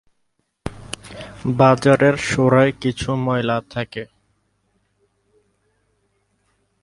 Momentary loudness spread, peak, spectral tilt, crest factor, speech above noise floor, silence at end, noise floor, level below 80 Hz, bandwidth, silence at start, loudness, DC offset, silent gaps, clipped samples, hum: 20 LU; 0 dBFS; -6.5 dB/octave; 20 dB; 53 dB; 2.8 s; -70 dBFS; -48 dBFS; 11.5 kHz; 0.65 s; -18 LUFS; under 0.1%; none; under 0.1%; none